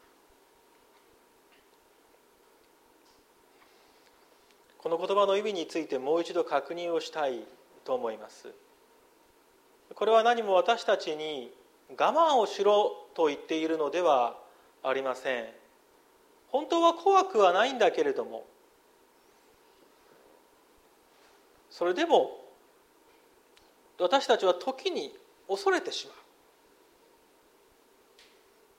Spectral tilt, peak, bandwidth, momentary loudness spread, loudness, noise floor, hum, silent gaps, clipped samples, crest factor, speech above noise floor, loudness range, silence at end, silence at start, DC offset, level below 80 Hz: -3 dB/octave; -10 dBFS; 16 kHz; 17 LU; -28 LUFS; -63 dBFS; none; none; under 0.1%; 22 dB; 35 dB; 9 LU; 2.65 s; 4.85 s; under 0.1%; -80 dBFS